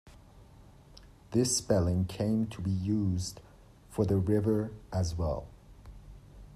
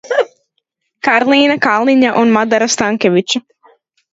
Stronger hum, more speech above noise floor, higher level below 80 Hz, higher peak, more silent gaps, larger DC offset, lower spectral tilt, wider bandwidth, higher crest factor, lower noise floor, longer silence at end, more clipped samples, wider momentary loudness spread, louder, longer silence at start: neither; second, 25 dB vs 57 dB; first, -50 dBFS vs -58 dBFS; second, -14 dBFS vs 0 dBFS; neither; neither; first, -6 dB/octave vs -3.5 dB/octave; first, 13.5 kHz vs 8 kHz; about the same, 18 dB vs 14 dB; second, -55 dBFS vs -69 dBFS; second, 0 s vs 0.75 s; neither; first, 12 LU vs 8 LU; second, -31 LUFS vs -12 LUFS; about the same, 0.05 s vs 0.05 s